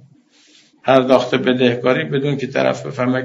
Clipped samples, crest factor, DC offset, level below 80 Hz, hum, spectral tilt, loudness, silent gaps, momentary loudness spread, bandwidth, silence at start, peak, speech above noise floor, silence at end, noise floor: under 0.1%; 18 dB; under 0.1%; -62 dBFS; none; -4.5 dB/octave; -17 LUFS; none; 7 LU; 7.8 kHz; 0.85 s; 0 dBFS; 35 dB; 0 s; -51 dBFS